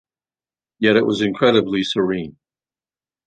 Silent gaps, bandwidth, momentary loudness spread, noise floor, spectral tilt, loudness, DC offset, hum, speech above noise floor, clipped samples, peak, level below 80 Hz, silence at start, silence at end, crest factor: none; 9.2 kHz; 8 LU; under -90 dBFS; -5.5 dB/octave; -18 LUFS; under 0.1%; none; over 72 dB; under 0.1%; -2 dBFS; -56 dBFS; 0.8 s; 0.95 s; 18 dB